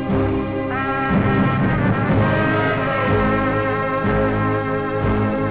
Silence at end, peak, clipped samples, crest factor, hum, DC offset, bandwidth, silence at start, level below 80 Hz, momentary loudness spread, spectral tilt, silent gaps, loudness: 0 s; -10 dBFS; under 0.1%; 8 dB; none; 0.6%; 4 kHz; 0 s; -34 dBFS; 4 LU; -11 dB/octave; none; -19 LUFS